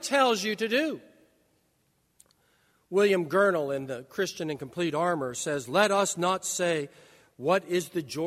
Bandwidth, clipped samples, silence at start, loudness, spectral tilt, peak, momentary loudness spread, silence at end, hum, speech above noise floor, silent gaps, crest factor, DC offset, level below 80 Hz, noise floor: 16 kHz; under 0.1%; 0 s; -27 LUFS; -3.5 dB/octave; -8 dBFS; 10 LU; 0 s; none; 44 dB; none; 20 dB; under 0.1%; -72 dBFS; -71 dBFS